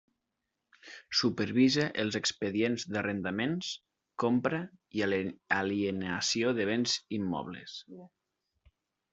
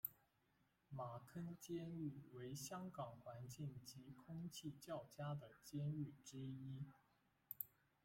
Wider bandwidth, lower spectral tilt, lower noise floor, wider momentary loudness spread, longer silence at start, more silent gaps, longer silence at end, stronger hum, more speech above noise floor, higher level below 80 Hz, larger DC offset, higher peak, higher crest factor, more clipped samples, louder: second, 8.2 kHz vs 16.5 kHz; second, -4 dB/octave vs -6 dB/octave; about the same, -85 dBFS vs -82 dBFS; first, 15 LU vs 8 LU; first, 0.85 s vs 0.05 s; neither; first, 1.05 s vs 0.35 s; neither; first, 54 dB vs 30 dB; first, -70 dBFS vs -82 dBFS; neither; first, -12 dBFS vs -26 dBFS; second, 20 dB vs 26 dB; neither; first, -31 LUFS vs -53 LUFS